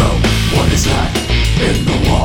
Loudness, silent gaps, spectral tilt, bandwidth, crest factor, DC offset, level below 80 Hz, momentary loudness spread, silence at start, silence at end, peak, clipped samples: -14 LUFS; none; -5 dB/octave; 17.5 kHz; 12 dB; under 0.1%; -18 dBFS; 2 LU; 0 s; 0 s; 0 dBFS; under 0.1%